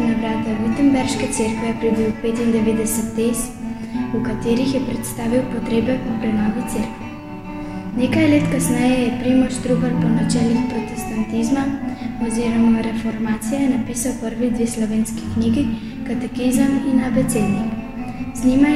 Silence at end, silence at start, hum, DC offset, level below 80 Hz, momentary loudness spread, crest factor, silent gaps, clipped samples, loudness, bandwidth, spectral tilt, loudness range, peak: 0 s; 0 s; none; 0.5%; -38 dBFS; 9 LU; 16 dB; none; under 0.1%; -20 LUFS; 15 kHz; -5.5 dB/octave; 3 LU; -4 dBFS